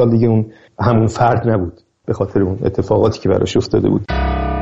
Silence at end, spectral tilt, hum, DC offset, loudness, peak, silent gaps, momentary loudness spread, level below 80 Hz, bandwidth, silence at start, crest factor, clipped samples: 0 s; -8 dB/octave; none; 0.4%; -16 LUFS; -4 dBFS; none; 7 LU; -30 dBFS; 8 kHz; 0 s; 12 dB; under 0.1%